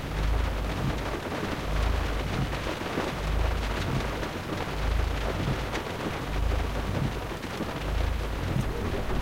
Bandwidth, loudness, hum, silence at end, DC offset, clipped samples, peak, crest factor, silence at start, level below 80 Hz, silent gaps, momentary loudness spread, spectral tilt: 16 kHz; -31 LUFS; none; 0 s; under 0.1%; under 0.1%; -14 dBFS; 14 dB; 0 s; -32 dBFS; none; 3 LU; -5.5 dB/octave